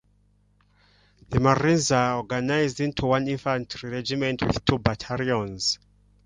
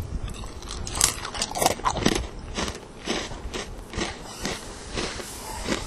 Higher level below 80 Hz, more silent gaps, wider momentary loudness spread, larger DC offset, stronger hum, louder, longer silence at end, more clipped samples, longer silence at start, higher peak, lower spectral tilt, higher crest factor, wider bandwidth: second, -46 dBFS vs -38 dBFS; neither; second, 8 LU vs 13 LU; neither; first, 50 Hz at -50 dBFS vs none; first, -25 LUFS vs -28 LUFS; first, 0.5 s vs 0 s; neither; first, 1.3 s vs 0 s; second, -4 dBFS vs 0 dBFS; first, -5 dB/octave vs -2.5 dB/octave; second, 22 dB vs 30 dB; second, 11 kHz vs 16 kHz